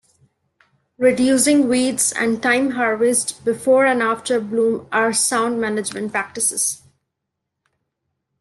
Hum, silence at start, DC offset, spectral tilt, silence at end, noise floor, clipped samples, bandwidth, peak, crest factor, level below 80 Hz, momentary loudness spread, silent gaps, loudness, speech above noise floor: none; 1 s; under 0.1%; -2.5 dB/octave; 1.65 s; -79 dBFS; under 0.1%; 12.5 kHz; -4 dBFS; 16 dB; -62 dBFS; 8 LU; none; -18 LUFS; 61 dB